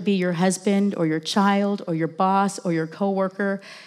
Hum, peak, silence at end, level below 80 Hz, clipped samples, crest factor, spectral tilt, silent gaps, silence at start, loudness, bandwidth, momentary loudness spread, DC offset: none; -6 dBFS; 0 s; -86 dBFS; under 0.1%; 16 dB; -5.5 dB/octave; none; 0 s; -22 LUFS; 13 kHz; 6 LU; under 0.1%